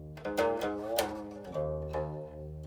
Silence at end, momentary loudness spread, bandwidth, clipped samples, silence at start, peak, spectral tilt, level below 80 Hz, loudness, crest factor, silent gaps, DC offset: 0 s; 10 LU; over 20 kHz; under 0.1%; 0 s; -10 dBFS; -5 dB/octave; -50 dBFS; -35 LUFS; 26 dB; none; under 0.1%